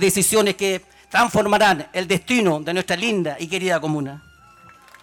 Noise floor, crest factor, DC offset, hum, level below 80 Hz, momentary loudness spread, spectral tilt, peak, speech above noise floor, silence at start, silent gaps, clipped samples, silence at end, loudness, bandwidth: -48 dBFS; 12 dB; under 0.1%; none; -54 dBFS; 8 LU; -3.5 dB/octave; -8 dBFS; 29 dB; 0 s; none; under 0.1%; 0.85 s; -20 LUFS; 19 kHz